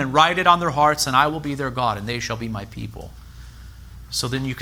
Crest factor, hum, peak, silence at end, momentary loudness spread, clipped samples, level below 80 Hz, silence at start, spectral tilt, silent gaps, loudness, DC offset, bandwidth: 20 dB; none; -2 dBFS; 0 s; 18 LU; under 0.1%; -42 dBFS; 0 s; -4 dB/octave; none; -20 LUFS; under 0.1%; over 20 kHz